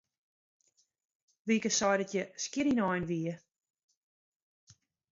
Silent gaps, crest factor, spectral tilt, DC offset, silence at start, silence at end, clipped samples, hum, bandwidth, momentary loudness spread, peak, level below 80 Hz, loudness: none; 20 dB; -4 dB/octave; under 0.1%; 1.45 s; 1.75 s; under 0.1%; none; 7.8 kHz; 11 LU; -16 dBFS; -70 dBFS; -32 LUFS